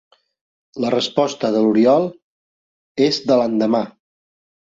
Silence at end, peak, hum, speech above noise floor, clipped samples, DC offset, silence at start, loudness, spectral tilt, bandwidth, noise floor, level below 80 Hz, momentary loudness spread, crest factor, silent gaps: 0.8 s; -2 dBFS; none; over 73 dB; under 0.1%; under 0.1%; 0.75 s; -18 LUFS; -5.5 dB/octave; 7.8 kHz; under -90 dBFS; -62 dBFS; 13 LU; 16 dB; 2.22-2.95 s